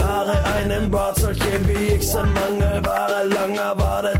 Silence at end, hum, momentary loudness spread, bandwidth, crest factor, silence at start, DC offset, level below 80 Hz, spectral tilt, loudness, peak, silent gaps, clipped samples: 0 s; none; 1 LU; 16.5 kHz; 14 dB; 0 s; under 0.1%; -26 dBFS; -5.5 dB/octave; -20 LUFS; -6 dBFS; none; under 0.1%